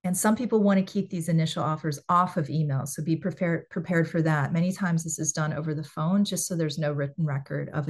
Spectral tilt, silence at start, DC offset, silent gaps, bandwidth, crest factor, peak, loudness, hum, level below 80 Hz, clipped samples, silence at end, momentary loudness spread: -5.5 dB/octave; 0.05 s; under 0.1%; none; 12.5 kHz; 16 dB; -10 dBFS; -27 LUFS; none; -66 dBFS; under 0.1%; 0 s; 6 LU